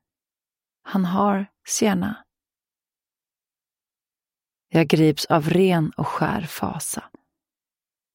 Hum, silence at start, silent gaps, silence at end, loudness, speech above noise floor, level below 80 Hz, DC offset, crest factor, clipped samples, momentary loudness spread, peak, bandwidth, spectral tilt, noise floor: none; 0.85 s; none; 1.1 s; -22 LUFS; over 69 dB; -58 dBFS; under 0.1%; 22 dB; under 0.1%; 10 LU; -2 dBFS; 16.5 kHz; -5.5 dB/octave; under -90 dBFS